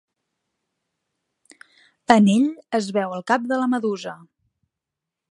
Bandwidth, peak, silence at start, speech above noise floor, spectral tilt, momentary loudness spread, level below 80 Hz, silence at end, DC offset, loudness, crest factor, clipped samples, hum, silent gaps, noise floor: 11.5 kHz; 0 dBFS; 2.1 s; 65 dB; -6 dB/octave; 14 LU; -70 dBFS; 1.15 s; under 0.1%; -20 LUFS; 24 dB; under 0.1%; none; none; -85 dBFS